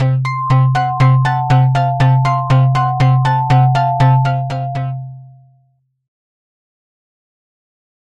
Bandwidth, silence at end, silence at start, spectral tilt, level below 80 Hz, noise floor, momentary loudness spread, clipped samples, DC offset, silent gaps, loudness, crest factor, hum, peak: 7.4 kHz; 2.75 s; 0 s; -8 dB/octave; -42 dBFS; -59 dBFS; 8 LU; under 0.1%; 0.3%; none; -13 LUFS; 14 dB; none; 0 dBFS